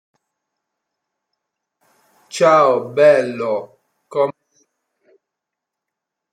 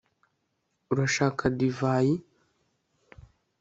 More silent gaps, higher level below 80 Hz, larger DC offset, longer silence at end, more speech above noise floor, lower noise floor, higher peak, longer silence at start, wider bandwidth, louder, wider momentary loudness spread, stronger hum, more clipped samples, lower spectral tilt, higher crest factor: neither; second, -74 dBFS vs -58 dBFS; neither; first, 2 s vs 1.4 s; first, 68 dB vs 51 dB; first, -82 dBFS vs -77 dBFS; first, -2 dBFS vs -10 dBFS; first, 2.35 s vs 0.9 s; first, 11.5 kHz vs 8 kHz; first, -16 LUFS vs -27 LUFS; first, 13 LU vs 5 LU; neither; neither; about the same, -5 dB/octave vs -6 dB/octave; about the same, 18 dB vs 20 dB